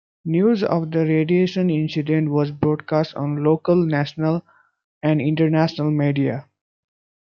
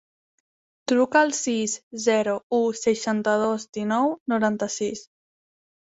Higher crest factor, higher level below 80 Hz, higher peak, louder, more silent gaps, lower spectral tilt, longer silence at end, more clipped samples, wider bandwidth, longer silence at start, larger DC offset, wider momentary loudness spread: about the same, 16 dB vs 20 dB; first, -62 dBFS vs -70 dBFS; about the same, -4 dBFS vs -4 dBFS; first, -20 LUFS vs -23 LUFS; second, 4.84-5.01 s vs 1.83-1.91 s, 2.43-2.50 s, 3.69-3.73 s, 4.20-4.26 s; first, -9 dB/octave vs -3.5 dB/octave; about the same, 0.85 s vs 0.9 s; neither; second, 6.6 kHz vs 8.2 kHz; second, 0.25 s vs 0.9 s; neither; second, 5 LU vs 9 LU